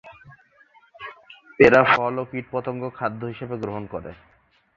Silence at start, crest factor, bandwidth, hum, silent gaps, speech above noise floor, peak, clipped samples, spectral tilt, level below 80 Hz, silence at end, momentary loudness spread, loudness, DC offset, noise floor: 0.05 s; 22 dB; 7.4 kHz; none; none; 35 dB; -2 dBFS; under 0.1%; -7 dB/octave; -56 dBFS; 0.65 s; 25 LU; -21 LUFS; under 0.1%; -56 dBFS